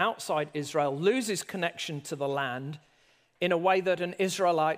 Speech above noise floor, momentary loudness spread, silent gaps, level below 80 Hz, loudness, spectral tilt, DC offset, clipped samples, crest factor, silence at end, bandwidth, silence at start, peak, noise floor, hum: 37 dB; 9 LU; none; -80 dBFS; -29 LUFS; -4.5 dB/octave; under 0.1%; under 0.1%; 18 dB; 0 s; 15.5 kHz; 0 s; -10 dBFS; -65 dBFS; none